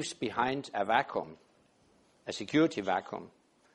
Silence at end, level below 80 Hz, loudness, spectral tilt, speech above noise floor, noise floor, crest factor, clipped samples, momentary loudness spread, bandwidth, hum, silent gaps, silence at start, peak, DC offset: 0.45 s; -72 dBFS; -32 LUFS; -4.5 dB/octave; 35 dB; -67 dBFS; 22 dB; under 0.1%; 16 LU; 11 kHz; none; none; 0 s; -12 dBFS; under 0.1%